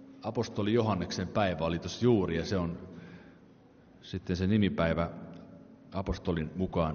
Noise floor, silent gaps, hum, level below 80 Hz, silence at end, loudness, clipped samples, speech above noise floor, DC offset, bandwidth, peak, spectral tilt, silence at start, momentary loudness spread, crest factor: -58 dBFS; none; none; -50 dBFS; 0 s; -31 LUFS; under 0.1%; 27 dB; under 0.1%; 6.8 kHz; -12 dBFS; -6 dB/octave; 0 s; 20 LU; 18 dB